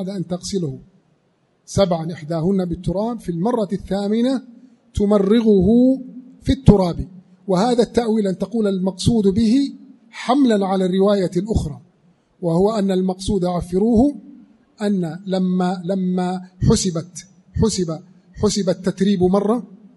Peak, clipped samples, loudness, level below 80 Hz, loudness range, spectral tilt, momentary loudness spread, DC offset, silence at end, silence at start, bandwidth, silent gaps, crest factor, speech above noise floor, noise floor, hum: 0 dBFS; under 0.1%; -19 LUFS; -36 dBFS; 4 LU; -6.5 dB/octave; 12 LU; under 0.1%; 0.2 s; 0 s; 11.5 kHz; none; 18 dB; 44 dB; -62 dBFS; none